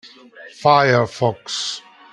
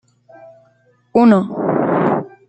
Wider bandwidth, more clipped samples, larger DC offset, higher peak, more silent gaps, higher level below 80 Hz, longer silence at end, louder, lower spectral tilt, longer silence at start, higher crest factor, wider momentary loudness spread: first, 11.5 kHz vs 8.4 kHz; neither; neither; about the same, 0 dBFS vs -2 dBFS; neither; about the same, -60 dBFS vs -60 dBFS; first, 0.35 s vs 0.2 s; second, -18 LUFS vs -15 LUFS; second, -4.5 dB/octave vs -9 dB/octave; second, 0.05 s vs 1.15 s; about the same, 18 dB vs 16 dB; first, 12 LU vs 7 LU